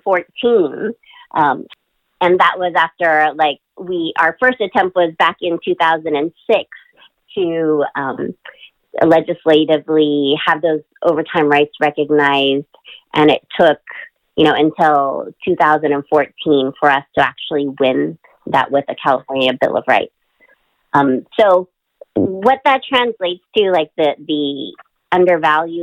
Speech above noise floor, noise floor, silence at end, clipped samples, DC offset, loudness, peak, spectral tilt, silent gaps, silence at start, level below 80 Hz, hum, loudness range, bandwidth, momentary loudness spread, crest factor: 40 dB; -55 dBFS; 0 s; under 0.1%; under 0.1%; -15 LUFS; -2 dBFS; -6.5 dB/octave; none; 0.05 s; -58 dBFS; none; 3 LU; 9.4 kHz; 10 LU; 14 dB